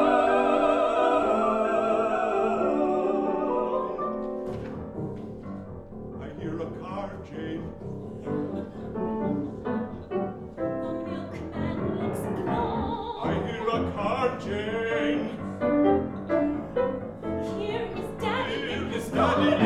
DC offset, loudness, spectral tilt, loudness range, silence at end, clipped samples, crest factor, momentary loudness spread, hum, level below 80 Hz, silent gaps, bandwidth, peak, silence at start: under 0.1%; -28 LUFS; -7 dB/octave; 10 LU; 0 s; under 0.1%; 18 dB; 13 LU; none; -50 dBFS; none; 13.5 kHz; -8 dBFS; 0 s